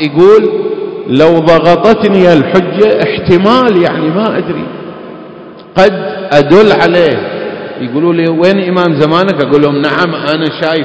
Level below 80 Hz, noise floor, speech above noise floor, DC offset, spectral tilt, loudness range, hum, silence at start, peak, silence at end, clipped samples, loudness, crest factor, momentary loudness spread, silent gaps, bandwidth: -42 dBFS; -30 dBFS; 22 dB; under 0.1%; -7 dB/octave; 3 LU; none; 0 s; 0 dBFS; 0 s; 4%; -9 LUFS; 8 dB; 13 LU; none; 8 kHz